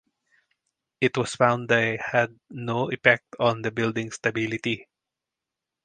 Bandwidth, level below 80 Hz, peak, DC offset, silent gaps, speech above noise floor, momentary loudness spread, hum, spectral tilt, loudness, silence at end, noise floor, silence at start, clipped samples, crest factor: 9.8 kHz; -64 dBFS; 0 dBFS; under 0.1%; none; 63 dB; 9 LU; none; -5 dB/octave; -24 LUFS; 1 s; -87 dBFS; 1 s; under 0.1%; 26 dB